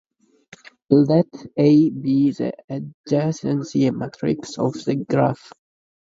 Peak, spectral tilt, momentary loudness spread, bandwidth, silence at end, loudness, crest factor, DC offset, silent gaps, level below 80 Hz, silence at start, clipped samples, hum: 0 dBFS; -8 dB/octave; 11 LU; 7.8 kHz; 0.65 s; -20 LUFS; 20 dB; under 0.1%; 2.64-2.68 s, 2.94-3.04 s; -60 dBFS; 0.9 s; under 0.1%; none